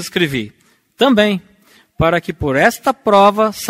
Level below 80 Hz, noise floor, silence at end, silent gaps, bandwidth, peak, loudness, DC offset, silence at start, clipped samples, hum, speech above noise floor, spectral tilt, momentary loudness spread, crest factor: -42 dBFS; -51 dBFS; 0 s; none; 16.5 kHz; 0 dBFS; -14 LUFS; under 0.1%; 0 s; under 0.1%; none; 36 dB; -5 dB/octave; 9 LU; 16 dB